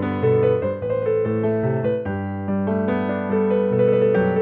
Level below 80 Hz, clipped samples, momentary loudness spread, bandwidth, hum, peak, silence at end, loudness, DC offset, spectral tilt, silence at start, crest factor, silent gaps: -54 dBFS; under 0.1%; 6 LU; 4 kHz; none; -8 dBFS; 0 s; -21 LUFS; under 0.1%; -11.5 dB/octave; 0 s; 12 dB; none